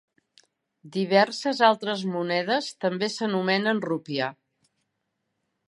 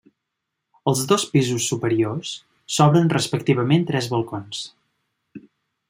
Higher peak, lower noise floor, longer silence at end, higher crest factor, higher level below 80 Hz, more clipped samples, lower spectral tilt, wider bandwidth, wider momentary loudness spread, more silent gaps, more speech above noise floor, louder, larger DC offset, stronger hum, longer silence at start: second, -6 dBFS vs -2 dBFS; about the same, -79 dBFS vs -80 dBFS; first, 1.35 s vs 0.5 s; about the same, 22 dB vs 20 dB; second, -80 dBFS vs -62 dBFS; neither; about the same, -5 dB/octave vs -5 dB/octave; second, 11.5 kHz vs 16 kHz; second, 9 LU vs 15 LU; neither; second, 54 dB vs 60 dB; second, -25 LUFS vs -21 LUFS; neither; neither; about the same, 0.85 s vs 0.85 s